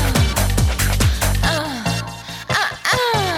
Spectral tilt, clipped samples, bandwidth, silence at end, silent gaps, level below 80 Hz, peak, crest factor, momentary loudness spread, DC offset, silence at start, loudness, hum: -4 dB/octave; under 0.1%; 18 kHz; 0 s; none; -24 dBFS; -4 dBFS; 14 dB; 6 LU; under 0.1%; 0 s; -18 LUFS; none